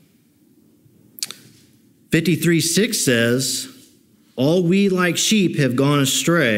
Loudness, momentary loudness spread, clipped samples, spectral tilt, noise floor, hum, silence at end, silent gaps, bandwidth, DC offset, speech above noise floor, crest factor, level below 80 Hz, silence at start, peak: -18 LUFS; 13 LU; under 0.1%; -4 dB/octave; -56 dBFS; none; 0 s; none; 16 kHz; under 0.1%; 39 dB; 18 dB; -60 dBFS; 1.2 s; -2 dBFS